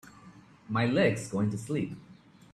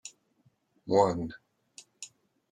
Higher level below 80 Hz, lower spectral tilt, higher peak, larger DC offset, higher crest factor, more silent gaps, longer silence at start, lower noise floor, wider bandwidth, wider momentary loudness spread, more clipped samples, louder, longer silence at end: about the same, -64 dBFS vs -66 dBFS; about the same, -6.5 dB/octave vs -5.5 dB/octave; about the same, -12 dBFS vs -10 dBFS; neither; about the same, 20 dB vs 24 dB; neither; about the same, 0.05 s vs 0.05 s; second, -54 dBFS vs -70 dBFS; first, 13 kHz vs 10.5 kHz; second, 11 LU vs 22 LU; neither; about the same, -30 LUFS vs -28 LUFS; about the same, 0.4 s vs 0.45 s